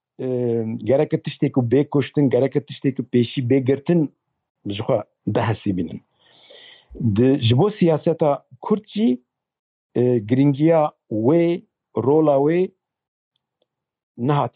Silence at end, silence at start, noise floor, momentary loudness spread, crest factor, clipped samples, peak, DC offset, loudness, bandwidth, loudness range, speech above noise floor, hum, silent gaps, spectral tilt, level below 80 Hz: 0.05 s; 0.2 s; -74 dBFS; 10 LU; 14 dB; under 0.1%; -6 dBFS; under 0.1%; -20 LUFS; 4.8 kHz; 4 LU; 55 dB; none; 4.50-4.55 s, 9.59-9.90 s, 13.08-13.31 s, 14.03-14.15 s; -12 dB/octave; -60 dBFS